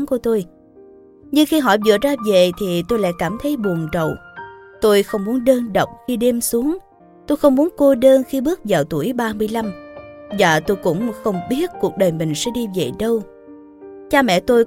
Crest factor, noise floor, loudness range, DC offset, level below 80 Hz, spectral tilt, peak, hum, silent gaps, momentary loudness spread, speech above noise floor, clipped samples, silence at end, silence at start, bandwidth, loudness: 18 dB; -45 dBFS; 3 LU; under 0.1%; -46 dBFS; -5 dB/octave; 0 dBFS; none; none; 9 LU; 28 dB; under 0.1%; 0 s; 0 s; 17 kHz; -18 LUFS